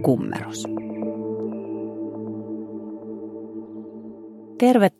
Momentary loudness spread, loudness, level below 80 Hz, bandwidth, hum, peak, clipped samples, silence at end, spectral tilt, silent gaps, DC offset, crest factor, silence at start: 17 LU; -27 LUFS; -68 dBFS; 15 kHz; none; -4 dBFS; under 0.1%; 0.1 s; -6.5 dB/octave; none; under 0.1%; 22 dB; 0 s